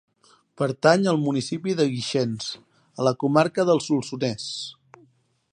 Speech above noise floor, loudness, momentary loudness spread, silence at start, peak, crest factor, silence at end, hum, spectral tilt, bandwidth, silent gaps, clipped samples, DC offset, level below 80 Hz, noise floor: 39 dB; -23 LUFS; 13 LU; 0.6 s; -2 dBFS; 22 dB; 0.8 s; none; -5.5 dB/octave; 10.5 kHz; none; under 0.1%; under 0.1%; -68 dBFS; -62 dBFS